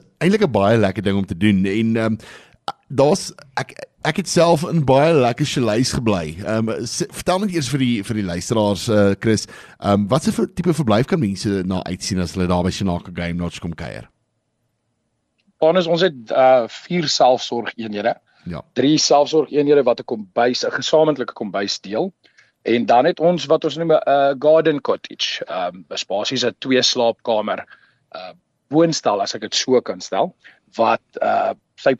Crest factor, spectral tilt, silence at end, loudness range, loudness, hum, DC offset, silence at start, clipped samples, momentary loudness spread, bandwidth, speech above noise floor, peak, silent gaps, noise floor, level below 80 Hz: 14 dB; -5 dB/octave; 0.05 s; 4 LU; -18 LUFS; none; under 0.1%; 0.2 s; under 0.1%; 12 LU; 13 kHz; 52 dB; -4 dBFS; none; -71 dBFS; -50 dBFS